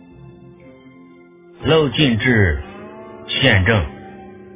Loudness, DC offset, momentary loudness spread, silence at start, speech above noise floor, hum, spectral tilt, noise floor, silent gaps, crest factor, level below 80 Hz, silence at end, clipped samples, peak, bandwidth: -16 LUFS; under 0.1%; 23 LU; 0.25 s; 30 dB; none; -9.5 dB/octave; -45 dBFS; none; 20 dB; -32 dBFS; 0.1 s; under 0.1%; 0 dBFS; 3.9 kHz